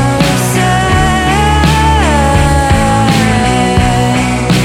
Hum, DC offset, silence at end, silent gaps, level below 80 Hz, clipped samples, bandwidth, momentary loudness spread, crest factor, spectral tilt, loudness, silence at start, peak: none; under 0.1%; 0 s; none; -18 dBFS; under 0.1%; 16.5 kHz; 2 LU; 8 dB; -5 dB/octave; -10 LUFS; 0 s; 0 dBFS